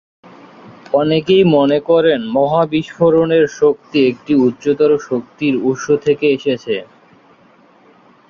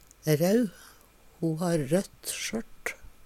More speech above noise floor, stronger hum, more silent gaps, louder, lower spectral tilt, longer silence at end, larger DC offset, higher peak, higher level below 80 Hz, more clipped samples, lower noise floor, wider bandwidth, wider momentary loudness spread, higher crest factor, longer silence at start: first, 35 dB vs 28 dB; neither; neither; first, -14 LUFS vs -29 LUFS; about the same, -6.5 dB/octave vs -5.5 dB/octave; first, 1.45 s vs 0 s; neither; first, 0 dBFS vs -12 dBFS; about the same, -54 dBFS vs -56 dBFS; neither; second, -48 dBFS vs -56 dBFS; second, 7.2 kHz vs 16.5 kHz; second, 7 LU vs 12 LU; about the same, 14 dB vs 18 dB; first, 0.65 s vs 0.25 s